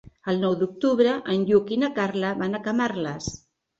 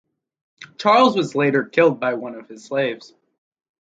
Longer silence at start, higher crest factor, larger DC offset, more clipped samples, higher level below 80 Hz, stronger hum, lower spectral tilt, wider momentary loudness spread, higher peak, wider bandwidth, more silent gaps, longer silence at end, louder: second, 0.25 s vs 0.6 s; about the same, 18 dB vs 20 dB; neither; neither; first, -58 dBFS vs -70 dBFS; neither; about the same, -6 dB/octave vs -5.5 dB/octave; second, 9 LU vs 17 LU; second, -6 dBFS vs -2 dBFS; about the same, 8 kHz vs 7.8 kHz; neither; second, 0.45 s vs 0.9 s; second, -24 LUFS vs -19 LUFS